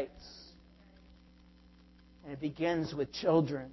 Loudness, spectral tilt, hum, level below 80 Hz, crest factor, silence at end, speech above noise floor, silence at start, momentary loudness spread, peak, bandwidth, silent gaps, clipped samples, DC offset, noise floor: -33 LUFS; -7 dB/octave; none; -62 dBFS; 20 dB; 0 s; 27 dB; 0 s; 24 LU; -16 dBFS; 6.2 kHz; none; under 0.1%; under 0.1%; -60 dBFS